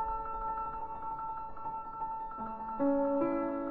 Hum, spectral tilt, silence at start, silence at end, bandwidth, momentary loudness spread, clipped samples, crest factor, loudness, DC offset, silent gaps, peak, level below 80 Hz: none; -10.5 dB/octave; 0 s; 0 s; 4.3 kHz; 10 LU; under 0.1%; 16 dB; -36 LUFS; under 0.1%; none; -20 dBFS; -54 dBFS